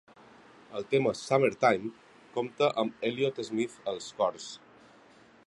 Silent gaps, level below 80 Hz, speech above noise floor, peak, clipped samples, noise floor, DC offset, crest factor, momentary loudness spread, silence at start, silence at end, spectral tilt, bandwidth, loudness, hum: none; -74 dBFS; 28 dB; -10 dBFS; under 0.1%; -58 dBFS; under 0.1%; 22 dB; 15 LU; 0.7 s; 0.9 s; -5 dB/octave; 11.5 kHz; -30 LUFS; none